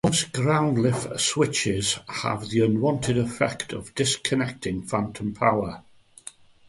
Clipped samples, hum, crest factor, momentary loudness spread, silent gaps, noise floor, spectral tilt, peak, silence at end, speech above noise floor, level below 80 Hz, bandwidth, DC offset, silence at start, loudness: under 0.1%; none; 20 dB; 11 LU; none; -47 dBFS; -4.5 dB/octave; -6 dBFS; 0.9 s; 22 dB; -52 dBFS; 11.5 kHz; under 0.1%; 0.05 s; -24 LUFS